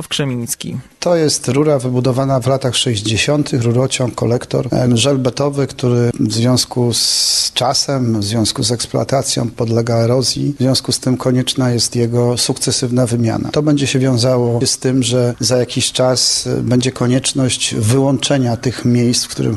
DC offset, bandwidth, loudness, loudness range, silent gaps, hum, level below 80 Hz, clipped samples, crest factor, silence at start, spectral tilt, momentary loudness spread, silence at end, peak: under 0.1%; 13 kHz; -15 LUFS; 1 LU; none; none; -44 dBFS; under 0.1%; 14 dB; 0 s; -4.5 dB/octave; 4 LU; 0 s; -2 dBFS